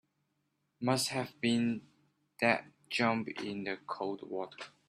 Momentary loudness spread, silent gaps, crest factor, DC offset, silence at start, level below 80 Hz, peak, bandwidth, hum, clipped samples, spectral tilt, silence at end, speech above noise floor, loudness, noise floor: 10 LU; none; 24 dB; under 0.1%; 0.8 s; -78 dBFS; -12 dBFS; 14.5 kHz; none; under 0.1%; -4.5 dB/octave; 0.2 s; 46 dB; -34 LUFS; -80 dBFS